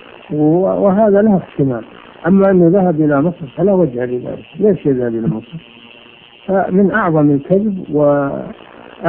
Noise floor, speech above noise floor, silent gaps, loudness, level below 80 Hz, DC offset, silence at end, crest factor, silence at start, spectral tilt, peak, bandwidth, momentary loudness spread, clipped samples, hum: -41 dBFS; 28 dB; none; -14 LUFS; -48 dBFS; under 0.1%; 0 s; 14 dB; 0.3 s; -13 dB/octave; 0 dBFS; 3.6 kHz; 13 LU; under 0.1%; none